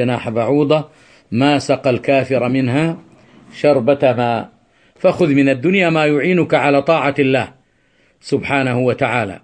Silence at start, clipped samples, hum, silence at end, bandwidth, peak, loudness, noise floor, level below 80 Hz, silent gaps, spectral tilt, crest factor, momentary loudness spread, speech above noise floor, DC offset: 0 s; under 0.1%; none; 0.05 s; 9 kHz; -2 dBFS; -15 LUFS; -57 dBFS; -54 dBFS; none; -7 dB/octave; 14 dB; 8 LU; 42 dB; under 0.1%